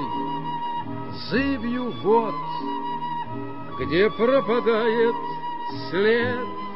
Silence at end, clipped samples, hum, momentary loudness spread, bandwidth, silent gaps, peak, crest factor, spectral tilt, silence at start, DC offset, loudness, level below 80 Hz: 0 s; under 0.1%; none; 11 LU; 5.8 kHz; none; -8 dBFS; 16 dB; -8 dB/octave; 0 s; 2%; -24 LUFS; -52 dBFS